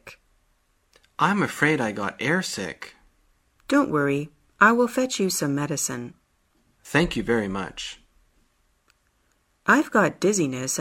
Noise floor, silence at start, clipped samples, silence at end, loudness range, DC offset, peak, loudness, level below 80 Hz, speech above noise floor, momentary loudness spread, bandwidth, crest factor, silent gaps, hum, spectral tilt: -67 dBFS; 0.05 s; under 0.1%; 0 s; 5 LU; under 0.1%; -2 dBFS; -23 LUFS; -54 dBFS; 44 dB; 16 LU; 16 kHz; 24 dB; none; none; -4 dB/octave